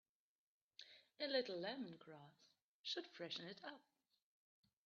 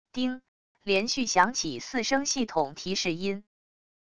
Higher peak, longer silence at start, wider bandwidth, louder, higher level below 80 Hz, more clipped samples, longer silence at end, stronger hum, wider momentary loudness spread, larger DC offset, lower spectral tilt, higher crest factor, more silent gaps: second, -28 dBFS vs -6 dBFS; first, 0.8 s vs 0.05 s; second, 7 kHz vs 11 kHz; second, -48 LUFS vs -28 LUFS; second, under -90 dBFS vs -62 dBFS; neither; first, 1.05 s vs 0.7 s; neither; first, 20 LU vs 10 LU; second, under 0.1% vs 0.4%; about the same, -1.5 dB/octave vs -2.5 dB/octave; about the same, 24 dB vs 22 dB; about the same, 2.62-2.84 s vs 0.48-0.75 s